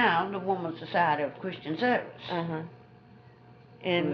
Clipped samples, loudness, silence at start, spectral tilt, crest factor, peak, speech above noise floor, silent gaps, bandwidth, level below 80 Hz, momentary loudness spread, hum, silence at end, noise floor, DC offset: under 0.1%; -30 LUFS; 0 s; -3.5 dB/octave; 20 dB; -10 dBFS; 24 dB; none; 6.2 kHz; -72 dBFS; 11 LU; none; 0 s; -54 dBFS; under 0.1%